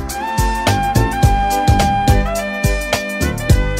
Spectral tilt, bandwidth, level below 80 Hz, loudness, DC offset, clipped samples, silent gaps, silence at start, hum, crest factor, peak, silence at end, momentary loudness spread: -5 dB/octave; 16.5 kHz; -20 dBFS; -16 LUFS; under 0.1%; under 0.1%; none; 0 s; none; 14 dB; 0 dBFS; 0 s; 5 LU